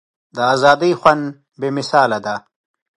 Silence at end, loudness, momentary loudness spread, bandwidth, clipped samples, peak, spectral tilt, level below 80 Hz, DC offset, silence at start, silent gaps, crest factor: 0.6 s; -16 LUFS; 15 LU; 11.5 kHz; under 0.1%; 0 dBFS; -5 dB/octave; -60 dBFS; under 0.1%; 0.35 s; none; 18 dB